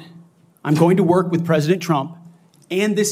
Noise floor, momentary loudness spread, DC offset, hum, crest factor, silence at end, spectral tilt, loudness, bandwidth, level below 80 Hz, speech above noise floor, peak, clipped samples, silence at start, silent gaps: -48 dBFS; 10 LU; under 0.1%; none; 16 dB; 0 s; -6 dB/octave; -18 LUFS; 16 kHz; -66 dBFS; 31 dB; -2 dBFS; under 0.1%; 0 s; none